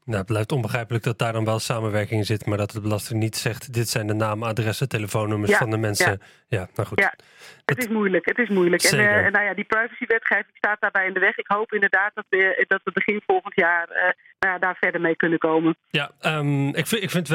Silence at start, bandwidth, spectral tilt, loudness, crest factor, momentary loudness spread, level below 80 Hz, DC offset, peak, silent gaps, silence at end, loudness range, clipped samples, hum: 0.05 s; 16.5 kHz; -5 dB/octave; -22 LUFS; 18 dB; 7 LU; -62 dBFS; under 0.1%; -6 dBFS; none; 0 s; 5 LU; under 0.1%; none